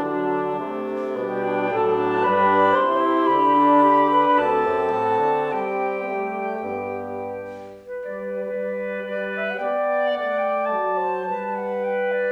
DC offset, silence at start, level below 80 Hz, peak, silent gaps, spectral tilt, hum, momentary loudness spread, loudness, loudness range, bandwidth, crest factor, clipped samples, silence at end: under 0.1%; 0 s; -64 dBFS; -6 dBFS; none; -7 dB/octave; none; 12 LU; -22 LUFS; 10 LU; 8.4 kHz; 16 dB; under 0.1%; 0 s